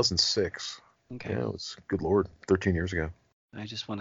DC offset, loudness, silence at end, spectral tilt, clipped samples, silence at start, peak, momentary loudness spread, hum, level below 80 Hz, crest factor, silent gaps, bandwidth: under 0.1%; -30 LUFS; 0 s; -4.5 dB/octave; under 0.1%; 0 s; -10 dBFS; 17 LU; none; -50 dBFS; 20 dB; 3.33-3.48 s; 7.6 kHz